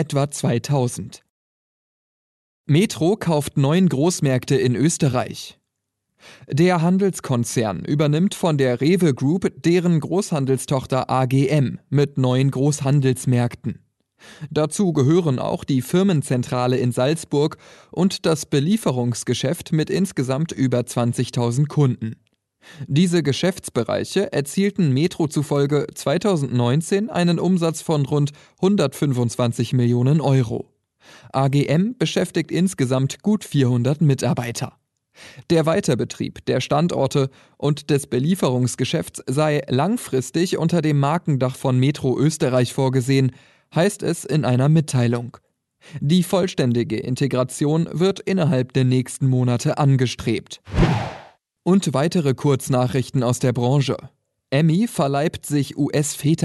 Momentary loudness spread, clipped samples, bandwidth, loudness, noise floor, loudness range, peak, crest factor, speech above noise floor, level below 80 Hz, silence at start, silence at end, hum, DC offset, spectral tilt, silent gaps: 6 LU; under 0.1%; 12.5 kHz; -20 LUFS; -78 dBFS; 2 LU; -4 dBFS; 16 dB; 58 dB; -46 dBFS; 0 s; 0 s; none; under 0.1%; -6.5 dB/octave; 1.30-2.64 s